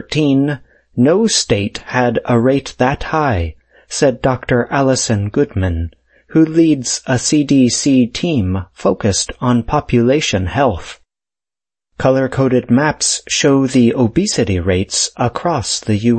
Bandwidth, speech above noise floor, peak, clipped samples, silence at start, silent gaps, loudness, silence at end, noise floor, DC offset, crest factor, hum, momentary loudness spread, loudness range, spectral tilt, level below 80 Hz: 8.8 kHz; over 76 dB; 0 dBFS; under 0.1%; 0 s; none; -15 LUFS; 0 s; under -90 dBFS; under 0.1%; 14 dB; none; 6 LU; 2 LU; -5 dB/octave; -36 dBFS